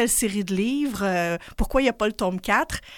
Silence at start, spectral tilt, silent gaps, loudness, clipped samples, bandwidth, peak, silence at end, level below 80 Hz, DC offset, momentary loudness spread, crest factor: 0 s; -4 dB/octave; none; -24 LUFS; under 0.1%; 17 kHz; -6 dBFS; 0 s; -36 dBFS; under 0.1%; 4 LU; 18 dB